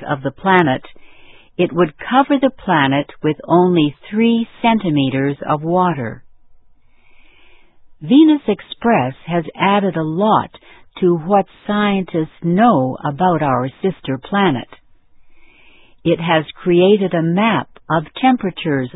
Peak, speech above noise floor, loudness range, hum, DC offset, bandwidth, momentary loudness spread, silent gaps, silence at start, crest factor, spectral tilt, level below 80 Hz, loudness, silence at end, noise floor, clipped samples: 0 dBFS; 31 dB; 4 LU; none; under 0.1%; 4 kHz; 9 LU; none; 0 s; 16 dB; -10.5 dB/octave; -52 dBFS; -16 LUFS; 0.05 s; -46 dBFS; under 0.1%